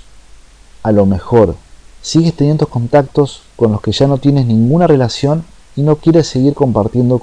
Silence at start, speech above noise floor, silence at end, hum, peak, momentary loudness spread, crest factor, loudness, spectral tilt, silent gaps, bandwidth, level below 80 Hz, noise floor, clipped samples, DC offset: 0.8 s; 28 dB; 0 s; none; 0 dBFS; 6 LU; 12 dB; -12 LUFS; -7.5 dB/octave; none; 10 kHz; -36 dBFS; -39 dBFS; under 0.1%; under 0.1%